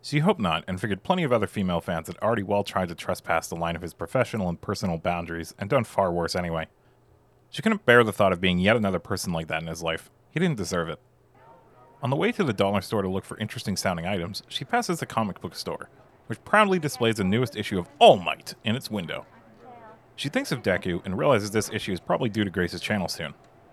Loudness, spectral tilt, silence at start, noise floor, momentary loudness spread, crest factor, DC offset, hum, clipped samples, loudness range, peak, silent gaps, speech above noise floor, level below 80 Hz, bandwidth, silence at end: -26 LUFS; -5 dB/octave; 0.05 s; -59 dBFS; 13 LU; 24 dB; under 0.1%; none; under 0.1%; 6 LU; -2 dBFS; none; 34 dB; -60 dBFS; 14.5 kHz; 0.4 s